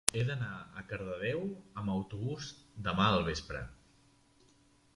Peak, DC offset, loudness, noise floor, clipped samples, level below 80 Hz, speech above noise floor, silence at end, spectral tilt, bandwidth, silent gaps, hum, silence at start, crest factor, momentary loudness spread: 0 dBFS; under 0.1%; -36 LUFS; -66 dBFS; under 0.1%; -54 dBFS; 31 dB; 1.2 s; -4.5 dB/octave; 11.5 kHz; none; none; 0.05 s; 36 dB; 14 LU